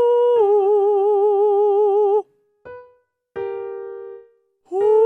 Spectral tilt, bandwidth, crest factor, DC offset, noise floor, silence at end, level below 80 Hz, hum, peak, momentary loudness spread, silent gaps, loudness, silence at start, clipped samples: -6.5 dB/octave; 3.4 kHz; 10 dB; under 0.1%; -57 dBFS; 0 s; -72 dBFS; none; -8 dBFS; 17 LU; none; -17 LUFS; 0 s; under 0.1%